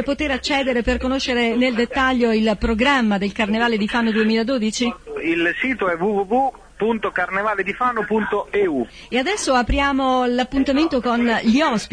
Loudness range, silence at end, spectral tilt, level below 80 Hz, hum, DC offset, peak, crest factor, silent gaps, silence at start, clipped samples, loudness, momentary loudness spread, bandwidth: 2 LU; 0.05 s; -4.5 dB/octave; -36 dBFS; none; under 0.1%; -6 dBFS; 14 dB; none; 0 s; under 0.1%; -19 LUFS; 5 LU; 10.5 kHz